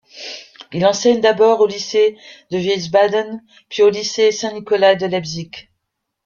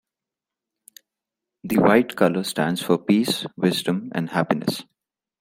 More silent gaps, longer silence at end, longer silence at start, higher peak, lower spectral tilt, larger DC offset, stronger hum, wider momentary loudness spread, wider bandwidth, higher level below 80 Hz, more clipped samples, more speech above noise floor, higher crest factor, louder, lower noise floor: neither; about the same, 0.65 s vs 0.6 s; second, 0.15 s vs 1.65 s; about the same, 0 dBFS vs -2 dBFS; second, -4 dB/octave vs -5.5 dB/octave; neither; neither; first, 17 LU vs 8 LU; second, 7.2 kHz vs 16.5 kHz; about the same, -60 dBFS vs -62 dBFS; neither; second, 60 dB vs 67 dB; about the same, 16 dB vs 20 dB; first, -16 LUFS vs -21 LUFS; second, -76 dBFS vs -88 dBFS